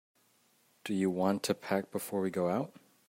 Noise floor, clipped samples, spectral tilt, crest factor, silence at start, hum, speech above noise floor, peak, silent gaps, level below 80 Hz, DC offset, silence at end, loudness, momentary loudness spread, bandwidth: -70 dBFS; under 0.1%; -5.5 dB/octave; 18 dB; 0.85 s; none; 37 dB; -16 dBFS; none; -80 dBFS; under 0.1%; 0.4 s; -33 LUFS; 7 LU; 16 kHz